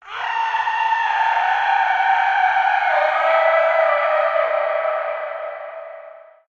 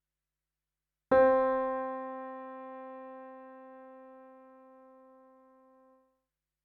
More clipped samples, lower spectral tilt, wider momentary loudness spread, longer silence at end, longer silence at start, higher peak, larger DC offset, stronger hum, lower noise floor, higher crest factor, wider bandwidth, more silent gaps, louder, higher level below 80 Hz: neither; second, -0.5 dB/octave vs -4.5 dB/octave; second, 13 LU vs 27 LU; second, 0.3 s vs 2.45 s; second, 0.05 s vs 1.1 s; first, -6 dBFS vs -14 dBFS; neither; neither; second, -41 dBFS vs under -90 dBFS; second, 14 dB vs 22 dB; first, 7.2 kHz vs 4.3 kHz; neither; first, -18 LUFS vs -29 LUFS; about the same, -68 dBFS vs -68 dBFS